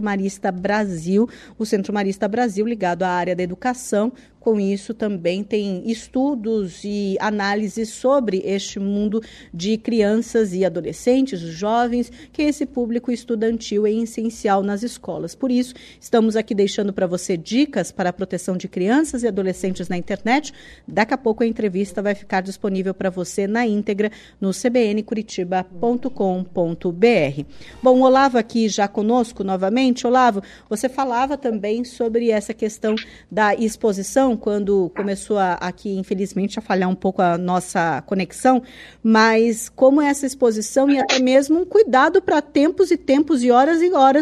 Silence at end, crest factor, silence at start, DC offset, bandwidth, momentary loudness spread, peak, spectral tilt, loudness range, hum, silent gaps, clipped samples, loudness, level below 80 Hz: 0 s; 16 dB; 0 s; under 0.1%; 13.5 kHz; 10 LU; -4 dBFS; -5.5 dB/octave; 6 LU; none; none; under 0.1%; -20 LUFS; -52 dBFS